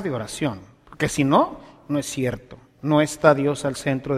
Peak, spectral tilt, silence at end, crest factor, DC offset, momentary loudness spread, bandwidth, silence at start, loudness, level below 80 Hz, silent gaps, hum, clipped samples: 0 dBFS; -5.5 dB/octave; 0 s; 22 dB; under 0.1%; 12 LU; 15 kHz; 0 s; -22 LUFS; -52 dBFS; none; none; under 0.1%